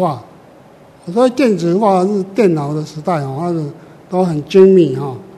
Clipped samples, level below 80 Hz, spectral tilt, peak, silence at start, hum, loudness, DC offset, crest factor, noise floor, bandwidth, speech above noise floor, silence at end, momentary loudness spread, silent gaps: 0.2%; -58 dBFS; -7.5 dB/octave; 0 dBFS; 0 s; none; -14 LUFS; under 0.1%; 14 dB; -42 dBFS; 11.5 kHz; 29 dB; 0 s; 13 LU; none